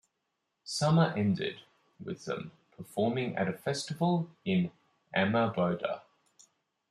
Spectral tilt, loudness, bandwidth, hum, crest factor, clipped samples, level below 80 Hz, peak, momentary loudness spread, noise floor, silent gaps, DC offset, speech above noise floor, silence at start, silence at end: -6 dB/octave; -31 LUFS; 13 kHz; none; 20 dB; under 0.1%; -72 dBFS; -12 dBFS; 15 LU; -82 dBFS; none; under 0.1%; 52 dB; 0.65 s; 0.9 s